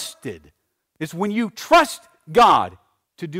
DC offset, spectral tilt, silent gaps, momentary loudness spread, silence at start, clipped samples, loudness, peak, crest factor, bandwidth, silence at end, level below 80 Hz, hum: under 0.1%; -4 dB/octave; none; 21 LU; 0 s; under 0.1%; -18 LUFS; -6 dBFS; 14 dB; 16 kHz; 0 s; -52 dBFS; none